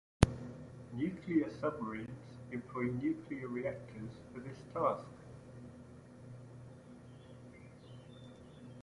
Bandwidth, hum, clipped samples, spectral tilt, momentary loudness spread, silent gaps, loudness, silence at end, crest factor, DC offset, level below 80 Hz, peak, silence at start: 11.5 kHz; none; under 0.1%; -7 dB/octave; 20 LU; none; -39 LUFS; 0 s; 34 dB; under 0.1%; -52 dBFS; -6 dBFS; 0.2 s